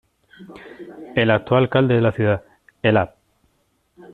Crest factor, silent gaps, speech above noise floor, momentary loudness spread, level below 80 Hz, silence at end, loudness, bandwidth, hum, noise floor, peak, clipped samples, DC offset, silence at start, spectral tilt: 18 dB; none; 47 dB; 22 LU; -54 dBFS; 1.05 s; -19 LUFS; 4.4 kHz; none; -66 dBFS; -2 dBFS; under 0.1%; under 0.1%; 0.4 s; -9 dB/octave